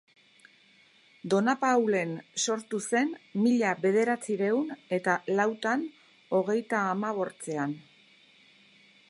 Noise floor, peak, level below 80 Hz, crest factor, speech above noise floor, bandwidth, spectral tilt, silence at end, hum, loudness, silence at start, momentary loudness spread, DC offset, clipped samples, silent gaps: -61 dBFS; -10 dBFS; -84 dBFS; 18 dB; 33 dB; 11.5 kHz; -4.5 dB/octave; 1.3 s; none; -28 LUFS; 1.25 s; 8 LU; under 0.1%; under 0.1%; none